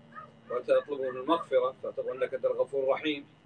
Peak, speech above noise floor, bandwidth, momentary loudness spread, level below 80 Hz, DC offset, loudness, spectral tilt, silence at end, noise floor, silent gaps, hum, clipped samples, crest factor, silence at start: -12 dBFS; 20 dB; 9.2 kHz; 9 LU; -78 dBFS; under 0.1%; -31 LUFS; -6 dB/octave; 0.2 s; -50 dBFS; none; none; under 0.1%; 18 dB; 0.1 s